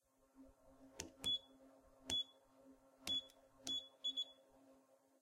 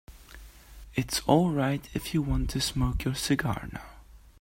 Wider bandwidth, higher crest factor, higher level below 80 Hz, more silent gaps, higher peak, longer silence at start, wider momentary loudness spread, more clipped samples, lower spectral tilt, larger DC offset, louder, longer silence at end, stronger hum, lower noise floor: about the same, 15.5 kHz vs 16.5 kHz; about the same, 26 dB vs 22 dB; second, -76 dBFS vs -40 dBFS; neither; second, -24 dBFS vs -8 dBFS; first, 0.4 s vs 0.1 s; about the same, 14 LU vs 12 LU; neither; second, -1 dB/octave vs -5 dB/octave; neither; second, -44 LUFS vs -28 LUFS; first, 0.5 s vs 0.25 s; neither; first, -72 dBFS vs -49 dBFS